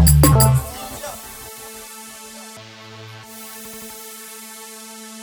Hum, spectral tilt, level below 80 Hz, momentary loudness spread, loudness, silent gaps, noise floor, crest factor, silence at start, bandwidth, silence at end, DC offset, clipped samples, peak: none; -5 dB/octave; -28 dBFS; 24 LU; -16 LUFS; none; -39 dBFS; 20 dB; 0 s; over 20 kHz; 0 s; under 0.1%; under 0.1%; -2 dBFS